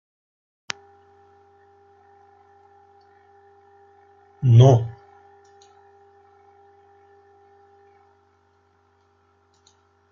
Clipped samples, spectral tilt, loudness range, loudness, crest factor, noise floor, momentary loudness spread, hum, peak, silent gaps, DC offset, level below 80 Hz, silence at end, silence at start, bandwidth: under 0.1%; -7.5 dB/octave; 21 LU; -18 LUFS; 26 dB; -62 dBFS; 21 LU; none; -2 dBFS; none; under 0.1%; -64 dBFS; 5.2 s; 4.4 s; 7 kHz